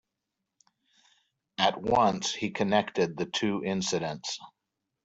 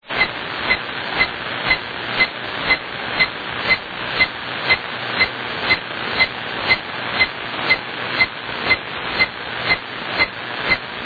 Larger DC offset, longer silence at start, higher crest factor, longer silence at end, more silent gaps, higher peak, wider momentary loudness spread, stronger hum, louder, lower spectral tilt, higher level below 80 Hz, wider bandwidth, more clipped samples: neither; first, 1.6 s vs 0.05 s; about the same, 22 dB vs 18 dB; first, 0.55 s vs 0 s; neither; second, -8 dBFS vs -2 dBFS; first, 11 LU vs 6 LU; neither; second, -28 LUFS vs -19 LUFS; about the same, -4 dB/octave vs -5 dB/octave; second, -62 dBFS vs -46 dBFS; first, 8.2 kHz vs 4.9 kHz; neither